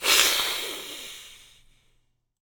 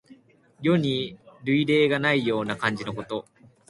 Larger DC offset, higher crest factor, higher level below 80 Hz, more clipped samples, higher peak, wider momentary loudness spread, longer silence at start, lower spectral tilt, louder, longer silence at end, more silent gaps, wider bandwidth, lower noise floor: neither; first, 28 dB vs 20 dB; about the same, -60 dBFS vs -62 dBFS; neither; first, 0 dBFS vs -6 dBFS; first, 24 LU vs 14 LU; about the same, 0 s vs 0.1 s; second, 2 dB/octave vs -6.5 dB/octave; first, -22 LUFS vs -25 LUFS; first, 1.05 s vs 0.5 s; neither; first, over 20 kHz vs 11.5 kHz; first, -68 dBFS vs -55 dBFS